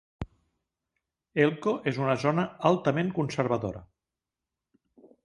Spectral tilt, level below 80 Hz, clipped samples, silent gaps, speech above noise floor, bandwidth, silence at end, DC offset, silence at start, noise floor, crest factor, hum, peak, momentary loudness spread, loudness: -7 dB/octave; -56 dBFS; under 0.1%; none; 62 dB; 11 kHz; 1.4 s; under 0.1%; 0.2 s; -89 dBFS; 24 dB; none; -6 dBFS; 18 LU; -27 LUFS